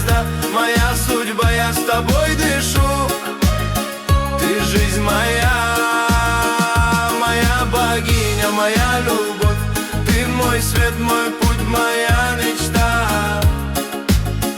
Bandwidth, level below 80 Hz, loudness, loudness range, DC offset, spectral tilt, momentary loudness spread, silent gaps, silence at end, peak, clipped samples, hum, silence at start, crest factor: 19.5 kHz; -24 dBFS; -17 LUFS; 1 LU; under 0.1%; -4.5 dB/octave; 3 LU; none; 0 s; -4 dBFS; under 0.1%; none; 0 s; 14 dB